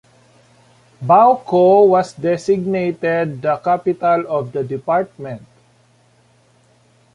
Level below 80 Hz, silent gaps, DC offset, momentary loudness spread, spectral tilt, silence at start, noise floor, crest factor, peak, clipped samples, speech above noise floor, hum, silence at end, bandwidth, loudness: -60 dBFS; none; under 0.1%; 14 LU; -7.5 dB/octave; 1 s; -54 dBFS; 16 dB; -2 dBFS; under 0.1%; 39 dB; none; 1.75 s; 10.5 kHz; -16 LUFS